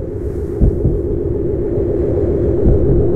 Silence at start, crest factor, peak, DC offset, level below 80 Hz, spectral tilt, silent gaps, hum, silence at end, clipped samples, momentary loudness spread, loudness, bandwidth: 0 s; 14 dB; 0 dBFS; under 0.1%; -20 dBFS; -12 dB/octave; none; none; 0 s; under 0.1%; 6 LU; -17 LUFS; 2.7 kHz